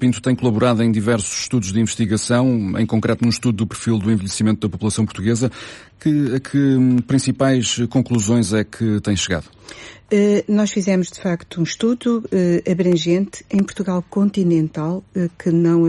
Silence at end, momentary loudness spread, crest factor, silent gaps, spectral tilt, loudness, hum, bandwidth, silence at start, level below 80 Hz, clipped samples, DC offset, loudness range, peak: 0 s; 7 LU; 12 dB; none; -5.5 dB/octave; -18 LUFS; none; 11.5 kHz; 0 s; -50 dBFS; under 0.1%; under 0.1%; 2 LU; -6 dBFS